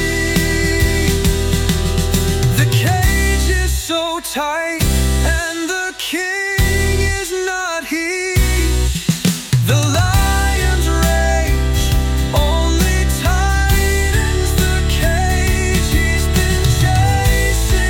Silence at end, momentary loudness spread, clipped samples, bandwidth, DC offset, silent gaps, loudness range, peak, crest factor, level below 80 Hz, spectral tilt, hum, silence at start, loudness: 0 s; 5 LU; under 0.1%; 18 kHz; under 0.1%; none; 2 LU; -2 dBFS; 12 dB; -18 dBFS; -4.5 dB/octave; none; 0 s; -16 LUFS